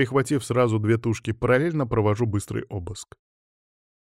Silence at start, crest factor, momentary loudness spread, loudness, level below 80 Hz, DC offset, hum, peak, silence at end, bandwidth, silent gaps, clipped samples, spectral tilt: 0 s; 16 dB; 12 LU; -24 LUFS; -50 dBFS; under 0.1%; none; -8 dBFS; 0.95 s; 13.5 kHz; none; under 0.1%; -6.5 dB/octave